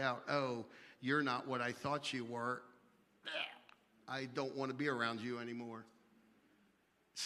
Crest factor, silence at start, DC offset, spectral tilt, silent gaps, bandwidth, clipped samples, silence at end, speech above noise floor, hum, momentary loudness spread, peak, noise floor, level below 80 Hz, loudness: 22 dB; 0 s; under 0.1%; -4.5 dB/octave; none; 13.5 kHz; under 0.1%; 0 s; 34 dB; none; 14 LU; -22 dBFS; -75 dBFS; -84 dBFS; -41 LUFS